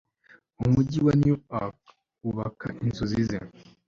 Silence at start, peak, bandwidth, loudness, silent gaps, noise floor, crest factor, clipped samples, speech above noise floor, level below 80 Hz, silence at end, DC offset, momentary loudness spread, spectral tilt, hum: 0.6 s; -10 dBFS; 7.4 kHz; -27 LUFS; none; -59 dBFS; 18 dB; under 0.1%; 33 dB; -48 dBFS; 0.4 s; under 0.1%; 14 LU; -8.5 dB/octave; none